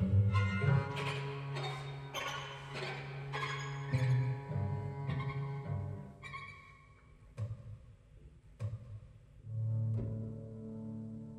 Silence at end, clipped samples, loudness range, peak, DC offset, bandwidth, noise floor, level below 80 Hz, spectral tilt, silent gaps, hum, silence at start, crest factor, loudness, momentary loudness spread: 0 s; under 0.1%; 10 LU; -18 dBFS; under 0.1%; 13.5 kHz; -60 dBFS; -60 dBFS; -6.5 dB/octave; none; none; 0 s; 20 dB; -38 LUFS; 17 LU